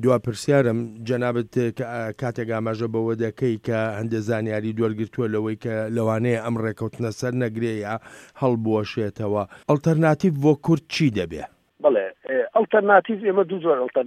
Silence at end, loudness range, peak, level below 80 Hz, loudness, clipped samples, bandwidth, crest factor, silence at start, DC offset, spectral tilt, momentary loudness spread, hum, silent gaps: 0 s; 4 LU; -2 dBFS; -60 dBFS; -23 LUFS; under 0.1%; 15 kHz; 20 dB; 0 s; under 0.1%; -7 dB/octave; 9 LU; none; none